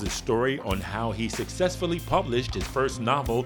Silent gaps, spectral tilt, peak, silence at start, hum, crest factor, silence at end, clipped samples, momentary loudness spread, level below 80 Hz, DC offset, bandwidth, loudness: none; -5 dB/octave; -8 dBFS; 0 s; none; 18 dB; 0 s; under 0.1%; 5 LU; -40 dBFS; under 0.1%; over 20 kHz; -27 LUFS